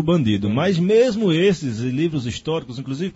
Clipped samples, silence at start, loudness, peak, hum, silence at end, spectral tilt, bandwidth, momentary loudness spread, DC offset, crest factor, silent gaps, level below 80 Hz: under 0.1%; 0 s; -20 LUFS; -6 dBFS; none; 0 s; -6.5 dB/octave; 8 kHz; 10 LU; under 0.1%; 14 dB; none; -50 dBFS